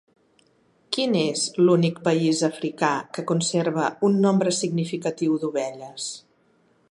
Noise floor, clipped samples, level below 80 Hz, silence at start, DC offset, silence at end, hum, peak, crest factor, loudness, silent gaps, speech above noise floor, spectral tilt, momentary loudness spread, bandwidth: -62 dBFS; under 0.1%; -72 dBFS; 0.9 s; under 0.1%; 0.7 s; none; -6 dBFS; 18 dB; -23 LUFS; none; 40 dB; -5 dB/octave; 12 LU; 11.5 kHz